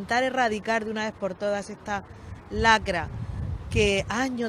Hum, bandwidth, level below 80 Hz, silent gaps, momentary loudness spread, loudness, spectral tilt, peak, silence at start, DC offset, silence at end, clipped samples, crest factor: none; 14.5 kHz; -42 dBFS; none; 13 LU; -26 LUFS; -4.5 dB/octave; -6 dBFS; 0 s; under 0.1%; 0 s; under 0.1%; 22 dB